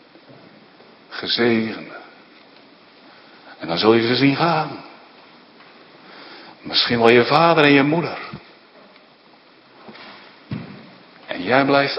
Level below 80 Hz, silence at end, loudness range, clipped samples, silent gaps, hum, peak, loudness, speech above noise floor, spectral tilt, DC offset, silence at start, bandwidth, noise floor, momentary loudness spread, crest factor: -62 dBFS; 0 s; 9 LU; under 0.1%; none; none; 0 dBFS; -17 LUFS; 34 dB; -7 dB/octave; under 0.1%; 1.1 s; 7.4 kHz; -50 dBFS; 26 LU; 22 dB